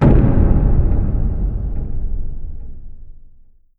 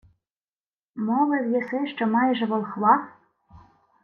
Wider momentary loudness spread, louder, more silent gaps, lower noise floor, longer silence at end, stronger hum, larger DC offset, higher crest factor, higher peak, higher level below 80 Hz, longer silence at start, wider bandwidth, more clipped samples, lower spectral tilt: first, 20 LU vs 10 LU; first, -19 LUFS vs -23 LUFS; neither; second, -44 dBFS vs under -90 dBFS; first, 0.6 s vs 0.45 s; neither; neither; about the same, 16 dB vs 20 dB; first, 0 dBFS vs -6 dBFS; first, -18 dBFS vs -68 dBFS; second, 0 s vs 0.95 s; second, 3.2 kHz vs 4.5 kHz; neither; first, -11.5 dB/octave vs -8.5 dB/octave